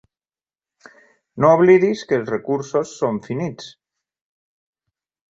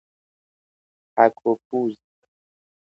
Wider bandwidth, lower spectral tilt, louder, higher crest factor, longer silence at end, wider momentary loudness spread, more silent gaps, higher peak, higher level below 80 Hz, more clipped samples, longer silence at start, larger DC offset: first, 7.8 kHz vs 6.4 kHz; second, -7 dB/octave vs -8.5 dB/octave; first, -18 LUFS vs -22 LUFS; about the same, 20 dB vs 24 dB; first, 1.6 s vs 0.95 s; first, 15 LU vs 10 LU; second, none vs 1.65-1.71 s; about the same, -2 dBFS vs -2 dBFS; first, -62 dBFS vs -76 dBFS; neither; first, 1.35 s vs 1.15 s; neither